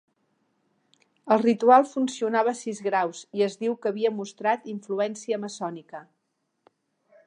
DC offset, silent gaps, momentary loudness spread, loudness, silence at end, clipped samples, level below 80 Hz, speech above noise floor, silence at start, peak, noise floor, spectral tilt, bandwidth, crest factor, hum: under 0.1%; none; 15 LU; -25 LUFS; 1.25 s; under 0.1%; -84 dBFS; 52 dB; 1.25 s; -4 dBFS; -77 dBFS; -5 dB/octave; 10.5 kHz; 22 dB; none